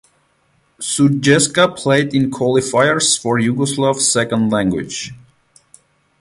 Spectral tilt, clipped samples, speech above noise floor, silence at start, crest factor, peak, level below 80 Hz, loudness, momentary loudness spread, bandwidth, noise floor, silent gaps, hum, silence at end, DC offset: -4 dB/octave; under 0.1%; 44 dB; 0.8 s; 16 dB; 0 dBFS; -52 dBFS; -15 LUFS; 9 LU; 11.5 kHz; -60 dBFS; none; none; 1.05 s; under 0.1%